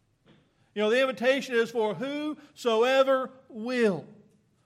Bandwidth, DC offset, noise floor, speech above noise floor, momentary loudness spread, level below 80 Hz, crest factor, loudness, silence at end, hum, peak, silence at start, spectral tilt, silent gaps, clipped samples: 14 kHz; under 0.1%; -62 dBFS; 36 dB; 14 LU; -82 dBFS; 16 dB; -27 LUFS; 0.55 s; none; -10 dBFS; 0.75 s; -4.5 dB/octave; none; under 0.1%